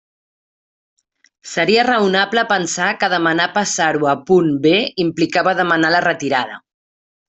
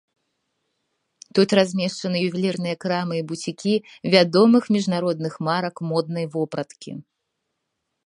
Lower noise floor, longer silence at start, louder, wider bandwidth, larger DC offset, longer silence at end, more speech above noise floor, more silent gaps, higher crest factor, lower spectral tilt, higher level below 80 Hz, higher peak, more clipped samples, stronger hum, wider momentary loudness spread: first, under -90 dBFS vs -78 dBFS; about the same, 1.45 s vs 1.35 s; first, -16 LUFS vs -22 LUFS; second, 8.4 kHz vs 11 kHz; neither; second, 0.7 s vs 1.05 s; first, over 74 dB vs 57 dB; neither; second, 16 dB vs 22 dB; second, -3.5 dB/octave vs -6 dB/octave; first, -58 dBFS vs -70 dBFS; about the same, -2 dBFS vs 0 dBFS; neither; neither; second, 6 LU vs 12 LU